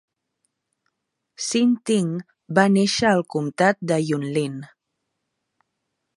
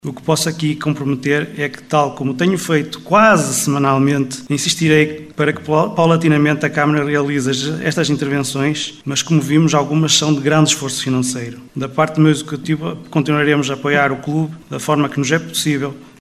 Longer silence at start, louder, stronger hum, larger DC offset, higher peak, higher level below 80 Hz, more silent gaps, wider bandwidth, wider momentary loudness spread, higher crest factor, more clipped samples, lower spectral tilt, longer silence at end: first, 1.4 s vs 0.05 s; second, -21 LUFS vs -16 LUFS; neither; neither; about the same, -2 dBFS vs 0 dBFS; second, -64 dBFS vs -54 dBFS; neither; second, 11.5 kHz vs 15 kHz; first, 11 LU vs 8 LU; first, 22 dB vs 16 dB; neither; about the same, -5 dB/octave vs -4.5 dB/octave; first, 1.55 s vs 0.1 s